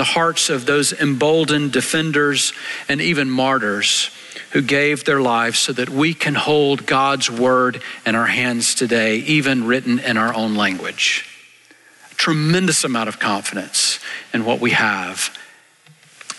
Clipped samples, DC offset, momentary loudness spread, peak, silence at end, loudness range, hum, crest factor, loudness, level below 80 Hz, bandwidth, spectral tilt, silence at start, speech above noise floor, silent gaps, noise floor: under 0.1%; under 0.1%; 6 LU; -6 dBFS; 0 s; 2 LU; none; 12 dB; -17 LUFS; -60 dBFS; 12.5 kHz; -3 dB/octave; 0 s; 32 dB; none; -50 dBFS